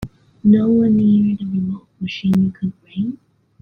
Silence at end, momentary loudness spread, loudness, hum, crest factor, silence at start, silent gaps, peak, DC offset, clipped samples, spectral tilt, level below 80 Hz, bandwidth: 0.45 s; 14 LU; -18 LUFS; none; 14 dB; 0 s; none; -4 dBFS; under 0.1%; under 0.1%; -9 dB/octave; -50 dBFS; 6 kHz